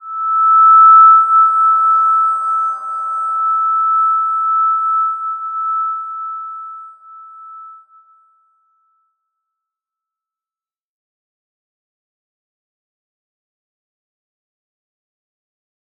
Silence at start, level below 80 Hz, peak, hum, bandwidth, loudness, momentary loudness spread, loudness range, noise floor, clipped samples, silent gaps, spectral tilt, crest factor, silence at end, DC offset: 0.05 s; under -90 dBFS; -2 dBFS; none; 8.8 kHz; -11 LUFS; 18 LU; 17 LU; under -90 dBFS; under 0.1%; none; -1 dB/octave; 16 dB; 8.25 s; under 0.1%